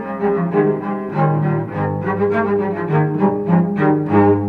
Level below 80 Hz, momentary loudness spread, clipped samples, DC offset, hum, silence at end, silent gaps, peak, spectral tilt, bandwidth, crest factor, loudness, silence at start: -52 dBFS; 5 LU; under 0.1%; under 0.1%; none; 0 s; none; -2 dBFS; -11 dB/octave; 4.3 kHz; 14 dB; -17 LUFS; 0 s